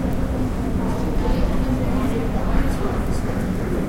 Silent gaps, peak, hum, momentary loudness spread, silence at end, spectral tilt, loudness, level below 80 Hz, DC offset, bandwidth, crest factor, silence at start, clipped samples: none; -6 dBFS; none; 2 LU; 0 s; -7.5 dB/octave; -23 LUFS; -24 dBFS; under 0.1%; 16.5 kHz; 14 dB; 0 s; under 0.1%